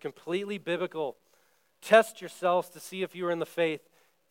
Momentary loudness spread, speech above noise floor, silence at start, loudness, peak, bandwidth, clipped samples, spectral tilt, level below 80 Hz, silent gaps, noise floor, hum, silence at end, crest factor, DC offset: 14 LU; 39 dB; 0.05 s; -29 LUFS; -6 dBFS; 16.5 kHz; under 0.1%; -4.5 dB/octave; under -90 dBFS; none; -68 dBFS; none; 0.55 s; 24 dB; under 0.1%